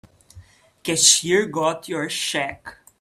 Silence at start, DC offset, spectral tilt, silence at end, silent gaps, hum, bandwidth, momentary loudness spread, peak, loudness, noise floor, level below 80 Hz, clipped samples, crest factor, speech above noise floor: 0.35 s; under 0.1%; -1.5 dB/octave; 0.25 s; none; none; 15.5 kHz; 16 LU; 0 dBFS; -19 LUFS; -48 dBFS; -60 dBFS; under 0.1%; 22 dB; 27 dB